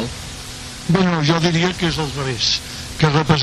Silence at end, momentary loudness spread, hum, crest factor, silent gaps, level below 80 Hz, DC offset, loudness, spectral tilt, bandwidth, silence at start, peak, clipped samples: 0 s; 14 LU; none; 14 dB; none; -38 dBFS; under 0.1%; -18 LUFS; -5 dB/octave; 13 kHz; 0 s; -4 dBFS; under 0.1%